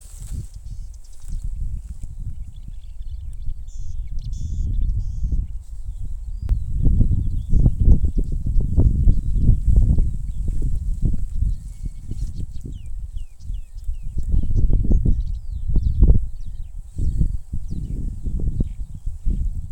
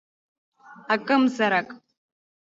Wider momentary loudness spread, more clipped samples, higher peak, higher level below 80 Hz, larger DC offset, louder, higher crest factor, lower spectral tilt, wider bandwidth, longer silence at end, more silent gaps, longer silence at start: first, 18 LU vs 6 LU; neither; first, 0 dBFS vs -8 dBFS; first, -22 dBFS vs -74 dBFS; neither; about the same, -25 LUFS vs -23 LUFS; about the same, 20 dB vs 18 dB; first, -9.5 dB/octave vs -5 dB/octave; first, 8.8 kHz vs 7.6 kHz; second, 0 s vs 0.8 s; neither; second, 0 s vs 0.7 s